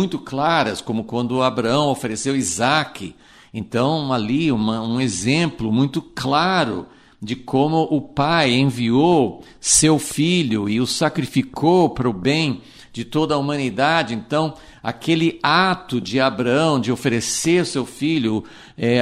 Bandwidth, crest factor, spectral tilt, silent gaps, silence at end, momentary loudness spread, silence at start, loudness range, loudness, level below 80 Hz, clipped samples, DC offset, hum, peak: 15.5 kHz; 18 dB; -4.5 dB/octave; none; 0 s; 10 LU; 0 s; 4 LU; -19 LUFS; -50 dBFS; under 0.1%; under 0.1%; none; -2 dBFS